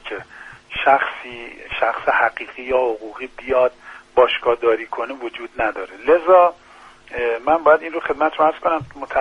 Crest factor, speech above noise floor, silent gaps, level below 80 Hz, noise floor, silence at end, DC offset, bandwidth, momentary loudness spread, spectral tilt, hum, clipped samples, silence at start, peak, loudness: 18 dB; 22 dB; none; -50 dBFS; -41 dBFS; 0 s; under 0.1%; 9.6 kHz; 17 LU; -5.5 dB/octave; none; under 0.1%; 0.05 s; 0 dBFS; -18 LUFS